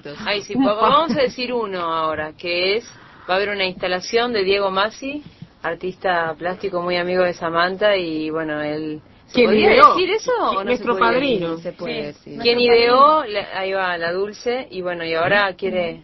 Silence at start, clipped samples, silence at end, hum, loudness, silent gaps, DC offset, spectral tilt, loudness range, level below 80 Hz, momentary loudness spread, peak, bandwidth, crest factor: 0.05 s; under 0.1%; 0.05 s; none; -19 LUFS; none; under 0.1%; -5 dB/octave; 5 LU; -52 dBFS; 13 LU; 0 dBFS; 6.2 kHz; 20 dB